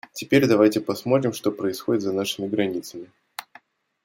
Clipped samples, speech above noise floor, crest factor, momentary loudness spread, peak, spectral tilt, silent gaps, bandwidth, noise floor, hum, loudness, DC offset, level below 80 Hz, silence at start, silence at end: under 0.1%; 31 dB; 18 dB; 20 LU; -4 dBFS; -5.5 dB/octave; none; 16.5 kHz; -54 dBFS; none; -22 LUFS; under 0.1%; -66 dBFS; 0.15 s; 0.65 s